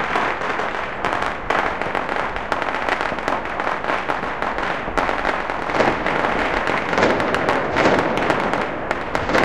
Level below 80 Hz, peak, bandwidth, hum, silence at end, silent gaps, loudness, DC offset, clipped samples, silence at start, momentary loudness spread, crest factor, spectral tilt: -40 dBFS; 0 dBFS; 16 kHz; none; 0 s; none; -21 LUFS; 2%; under 0.1%; 0 s; 6 LU; 20 dB; -5 dB/octave